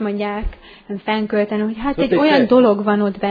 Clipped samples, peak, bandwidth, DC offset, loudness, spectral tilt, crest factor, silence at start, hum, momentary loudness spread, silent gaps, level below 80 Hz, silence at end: under 0.1%; 0 dBFS; 5 kHz; under 0.1%; -17 LUFS; -8.5 dB/octave; 16 dB; 0 s; none; 15 LU; none; -36 dBFS; 0 s